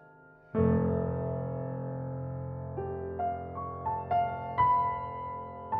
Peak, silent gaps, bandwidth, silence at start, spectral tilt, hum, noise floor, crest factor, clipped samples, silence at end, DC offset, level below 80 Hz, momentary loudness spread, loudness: -14 dBFS; none; 4.3 kHz; 0 s; -8.5 dB/octave; none; -56 dBFS; 18 dB; under 0.1%; 0 s; under 0.1%; -52 dBFS; 12 LU; -32 LUFS